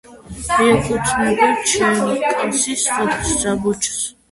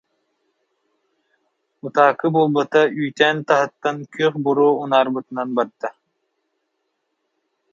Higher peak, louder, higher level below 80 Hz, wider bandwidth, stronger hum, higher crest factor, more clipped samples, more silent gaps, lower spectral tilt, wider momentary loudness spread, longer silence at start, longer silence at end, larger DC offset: about the same, -2 dBFS vs 0 dBFS; about the same, -17 LUFS vs -19 LUFS; first, -40 dBFS vs -74 dBFS; first, 12 kHz vs 7.4 kHz; neither; about the same, 16 dB vs 20 dB; neither; neither; second, -3 dB/octave vs -6 dB/octave; second, 5 LU vs 10 LU; second, 0.1 s vs 1.85 s; second, 0.2 s vs 1.8 s; neither